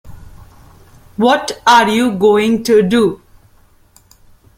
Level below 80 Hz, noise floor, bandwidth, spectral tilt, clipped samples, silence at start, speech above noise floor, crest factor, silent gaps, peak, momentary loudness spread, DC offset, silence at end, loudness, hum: -46 dBFS; -49 dBFS; 16 kHz; -4.5 dB/octave; under 0.1%; 0.05 s; 37 dB; 16 dB; none; 0 dBFS; 7 LU; under 0.1%; 1.45 s; -12 LUFS; none